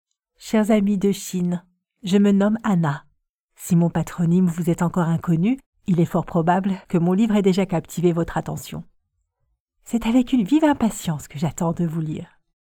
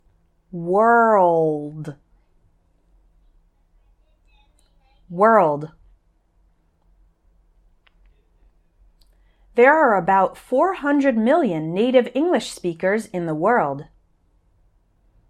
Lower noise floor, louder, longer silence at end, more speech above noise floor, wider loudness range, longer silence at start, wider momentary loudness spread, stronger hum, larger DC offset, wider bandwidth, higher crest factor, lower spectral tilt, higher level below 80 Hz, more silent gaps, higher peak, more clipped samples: first, -73 dBFS vs -61 dBFS; second, -21 LUFS vs -18 LUFS; second, 0.5 s vs 1.45 s; first, 53 dB vs 43 dB; second, 2 LU vs 7 LU; second, 0.4 s vs 0.55 s; second, 10 LU vs 17 LU; neither; neither; first, 17 kHz vs 13 kHz; about the same, 16 dB vs 20 dB; about the same, -7 dB/octave vs -6.5 dB/octave; first, -48 dBFS vs -58 dBFS; first, 3.30-3.48 s, 5.66-5.73 s, 9.60-9.66 s vs none; second, -6 dBFS vs -2 dBFS; neither